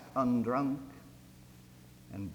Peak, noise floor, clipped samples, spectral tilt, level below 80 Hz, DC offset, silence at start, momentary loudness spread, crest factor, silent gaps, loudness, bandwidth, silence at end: -18 dBFS; -56 dBFS; under 0.1%; -8 dB/octave; -64 dBFS; under 0.1%; 0 s; 25 LU; 18 dB; none; -33 LUFS; over 20 kHz; 0 s